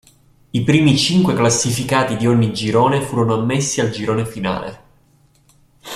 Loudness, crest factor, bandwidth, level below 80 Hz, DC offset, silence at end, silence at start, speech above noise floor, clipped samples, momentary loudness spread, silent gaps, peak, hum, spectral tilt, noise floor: -17 LUFS; 16 dB; 15 kHz; -48 dBFS; under 0.1%; 0 s; 0.55 s; 38 dB; under 0.1%; 9 LU; none; -2 dBFS; none; -5 dB/octave; -55 dBFS